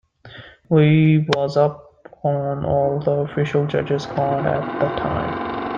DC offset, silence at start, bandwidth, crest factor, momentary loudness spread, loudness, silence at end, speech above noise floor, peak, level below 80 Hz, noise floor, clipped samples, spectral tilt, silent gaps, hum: under 0.1%; 0.25 s; 7.2 kHz; 18 dB; 8 LU; -20 LUFS; 0 s; 23 dB; -2 dBFS; -48 dBFS; -42 dBFS; under 0.1%; -8 dB/octave; none; none